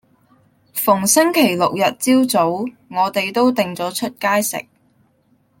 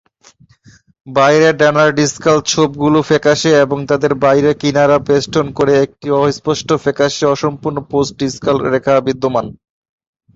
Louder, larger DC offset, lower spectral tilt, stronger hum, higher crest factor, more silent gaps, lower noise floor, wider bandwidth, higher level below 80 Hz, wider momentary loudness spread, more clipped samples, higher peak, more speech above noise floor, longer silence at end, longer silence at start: second, -17 LUFS vs -13 LUFS; neither; second, -3.5 dB/octave vs -5 dB/octave; neither; about the same, 16 dB vs 14 dB; neither; first, -59 dBFS vs -48 dBFS; first, 17 kHz vs 8 kHz; second, -64 dBFS vs -48 dBFS; first, 10 LU vs 7 LU; neither; about the same, -2 dBFS vs 0 dBFS; first, 43 dB vs 35 dB; first, 1 s vs 0.85 s; second, 0.75 s vs 1.05 s